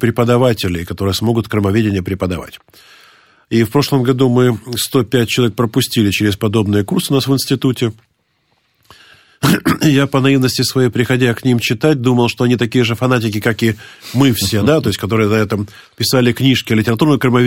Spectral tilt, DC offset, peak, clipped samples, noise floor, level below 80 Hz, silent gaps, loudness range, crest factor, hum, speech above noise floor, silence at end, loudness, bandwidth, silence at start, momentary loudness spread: -5.5 dB/octave; under 0.1%; 0 dBFS; under 0.1%; -62 dBFS; -46 dBFS; none; 4 LU; 14 dB; none; 48 dB; 0 s; -14 LUFS; 16.5 kHz; 0 s; 6 LU